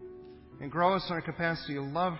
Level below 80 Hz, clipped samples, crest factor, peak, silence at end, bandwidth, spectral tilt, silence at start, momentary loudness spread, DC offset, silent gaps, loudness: -60 dBFS; under 0.1%; 20 dB; -12 dBFS; 0 s; 5.8 kHz; -9.5 dB/octave; 0 s; 21 LU; under 0.1%; none; -31 LUFS